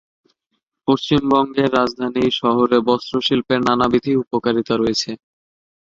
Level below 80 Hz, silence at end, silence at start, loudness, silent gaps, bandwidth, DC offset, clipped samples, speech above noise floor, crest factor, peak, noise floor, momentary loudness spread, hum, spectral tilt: -50 dBFS; 0.8 s; 0.85 s; -18 LUFS; none; 7.6 kHz; under 0.1%; under 0.1%; 57 dB; 18 dB; 0 dBFS; -74 dBFS; 5 LU; none; -5.5 dB/octave